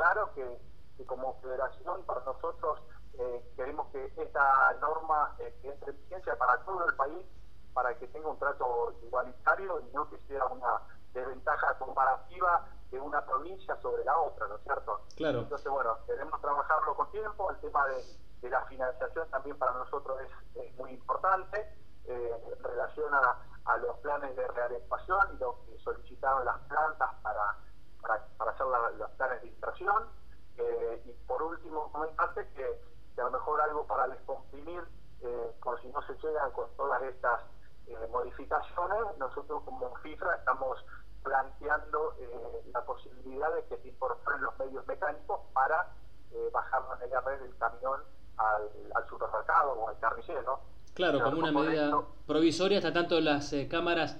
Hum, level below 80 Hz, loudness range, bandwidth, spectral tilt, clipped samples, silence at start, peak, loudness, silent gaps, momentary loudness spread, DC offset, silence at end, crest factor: none; -56 dBFS; 5 LU; 9.8 kHz; -5 dB/octave; under 0.1%; 0 s; -14 dBFS; -33 LUFS; none; 14 LU; 0.8%; 0 s; 20 dB